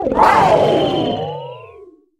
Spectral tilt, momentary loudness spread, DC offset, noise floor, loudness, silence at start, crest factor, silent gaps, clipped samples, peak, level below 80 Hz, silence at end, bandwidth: -6 dB/octave; 17 LU; under 0.1%; -42 dBFS; -14 LUFS; 0 s; 16 dB; none; under 0.1%; 0 dBFS; -42 dBFS; 0.35 s; 15.5 kHz